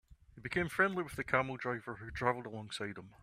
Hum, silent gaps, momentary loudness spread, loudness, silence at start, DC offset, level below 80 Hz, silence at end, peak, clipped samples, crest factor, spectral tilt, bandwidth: none; none; 12 LU; -36 LUFS; 0.1 s; under 0.1%; -60 dBFS; 0.05 s; -14 dBFS; under 0.1%; 24 dB; -5.5 dB/octave; 15.5 kHz